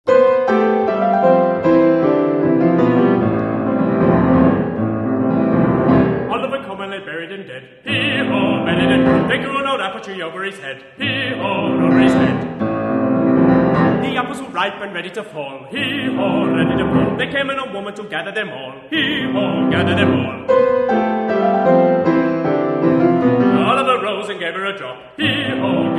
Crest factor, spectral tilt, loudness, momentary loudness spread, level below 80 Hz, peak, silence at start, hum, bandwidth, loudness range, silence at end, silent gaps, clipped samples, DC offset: 16 dB; -7.5 dB/octave; -16 LUFS; 13 LU; -46 dBFS; 0 dBFS; 0.05 s; none; 10.5 kHz; 4 LU; 0 s; none; under 0.1%; under 0.1%